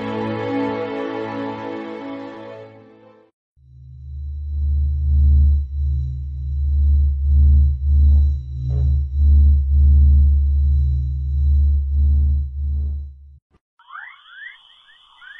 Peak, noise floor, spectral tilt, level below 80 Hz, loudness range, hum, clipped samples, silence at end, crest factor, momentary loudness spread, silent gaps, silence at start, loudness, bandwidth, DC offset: -6 dBFS; -50 dBFS; -10 dB/octave; -18 dBFS; 13 LU; none; under 0.1%; 0.05 s; 10 dB; 21 LU; 3.34-3.56 s, 13.42-13.50 s, 13.61-13.77 s; 0 s; -19 LUFS; 3.8 kHz; under 0.1%